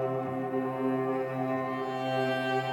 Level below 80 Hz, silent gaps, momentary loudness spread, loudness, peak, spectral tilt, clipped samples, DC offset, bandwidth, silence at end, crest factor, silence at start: -76 dBFS; none; 3 LU; -31 LUFS; -18 dBFS; -7 dB/octave; under 0.1%; under 0.1%; 17 kHz; 0 s; 12 dB; 0 s